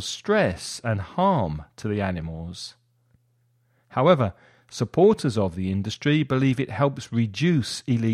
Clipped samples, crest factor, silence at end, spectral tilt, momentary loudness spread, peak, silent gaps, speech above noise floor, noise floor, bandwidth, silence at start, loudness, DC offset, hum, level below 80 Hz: under 0.1%; 18 dB; 0 s; -6 dB/octave; 13 LU; -6 dBFS; none; 43 dB; -66 dBFS; 13 kHz; 0 s; -24 LUFS; under 0.1%; none; -50 dBFS